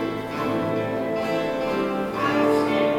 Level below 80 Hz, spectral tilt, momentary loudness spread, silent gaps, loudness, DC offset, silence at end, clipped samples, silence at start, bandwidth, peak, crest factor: -54 dBFS; -6 dB/octave; 5 LU; none; -24 LUFS; under 0.1%; 0 s; under 0.1%; 0 s; 18 kHz; -8 dBFS; 14 dB